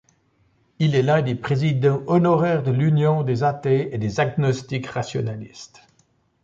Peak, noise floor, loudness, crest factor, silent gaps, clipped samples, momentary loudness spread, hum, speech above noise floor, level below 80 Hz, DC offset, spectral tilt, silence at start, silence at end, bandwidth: -6 dBFS; -63 dBFS; -21 LUFS; 14 dB; none; under 0.1%; 9 LU; none; 43 dB; -56 dBFS; under 0.1%; -7.5 dB/octave; 0.8 s; 0.8 s; 7.6 kHz